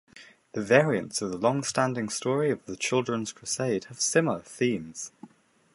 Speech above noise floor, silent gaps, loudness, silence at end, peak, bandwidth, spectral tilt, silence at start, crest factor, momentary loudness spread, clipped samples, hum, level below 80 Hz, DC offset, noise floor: 30 dB; none; -27 LUFS; 0.5 s; -4 dBFS; 11.5 kHz; -4 dB/octave; 0.15 s; 24 dB; 11 LU; under 0.1%; none; -66 dBFS; under 0.1%; -58 dBFS